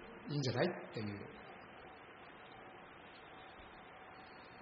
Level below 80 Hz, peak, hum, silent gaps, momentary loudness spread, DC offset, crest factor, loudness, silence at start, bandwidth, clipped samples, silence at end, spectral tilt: -74 dBFS; -20 dBFS; none; none; 17 LU; under 0.1%; 24 dB; -46 LUFS; 0 s; 5.2 kHz; under 0.1%; 0 s; -5 dB/octave